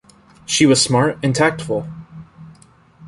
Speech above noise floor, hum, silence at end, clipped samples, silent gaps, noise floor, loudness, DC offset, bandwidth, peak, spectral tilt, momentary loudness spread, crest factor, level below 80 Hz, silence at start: 33 dB; none; 0 s; under 0.1%; none; -49 dBFS; -16 LUFS; under 0.1%; 11.5 kHz; -2 dBFS; -4 dB/octave; 21 LU; 18 dB; -50 dBFS; 0.5 s